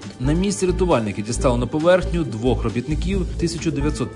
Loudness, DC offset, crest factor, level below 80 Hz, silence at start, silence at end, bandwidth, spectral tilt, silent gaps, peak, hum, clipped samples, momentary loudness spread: -21 LUFS; under 0.1%; 16 dB; -28 dBFS; 0 s; 0 s; 11 kHz; -6 dB/octave; none; -4 dBFS; none; under 0.1%; 7 LU